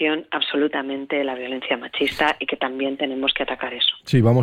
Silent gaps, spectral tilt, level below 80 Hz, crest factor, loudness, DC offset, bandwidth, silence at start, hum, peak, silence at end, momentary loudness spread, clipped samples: none; -6.5 dB/octave; -54 dBFS; 16 dB; -22 LUFS; under 0.1%; 14 kHz; 0 s; none; -6 dBFS; 0 s; 6 LU; under 0.1%